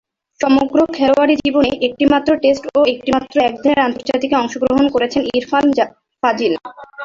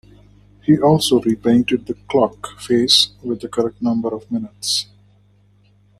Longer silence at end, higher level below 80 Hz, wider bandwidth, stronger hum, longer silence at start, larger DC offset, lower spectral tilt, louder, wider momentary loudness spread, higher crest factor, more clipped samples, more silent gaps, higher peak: second, 0 s vs 1.15 s; about the same, -48 dBFS vs -52 dBFS; second, 7.6 kHz vs 13.5 kHz; second, none vs 50 Hz at -40 dBFS; second, 0.4 s vs 0.7 s; neither; about the same, -5 dB/octave vs -4.5 dB/octave; about the same, -15 LUFS vs -17 LUFS; second, 6 LU vs 13 LU; about the same, 14 dB vs 18 dB; neither; neither; about the same, 0 dBFS vs 0 dBFS